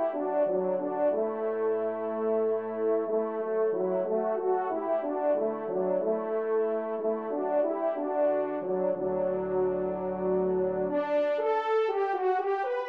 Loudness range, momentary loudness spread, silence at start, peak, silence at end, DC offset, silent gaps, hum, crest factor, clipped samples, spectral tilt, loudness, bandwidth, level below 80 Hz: 1 LU; 3 LU; 0 s; -18 dBFS; 0 s; under 0.1%; none; none; 12 dB; under 0.1%; -9 dB/octave; -29 LUFS; 5.6 kHz; -66 dBFS